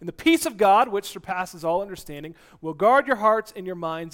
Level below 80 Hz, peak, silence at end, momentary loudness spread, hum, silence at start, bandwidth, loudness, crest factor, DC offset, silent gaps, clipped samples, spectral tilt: -56 dBFS; -6 dBFS; 0.05 s; 18 LU; none; 0 s; 17 kHz; -22 LUFS; 16 dB; under 0.1%; none; under 0.1%; -4 dB/octave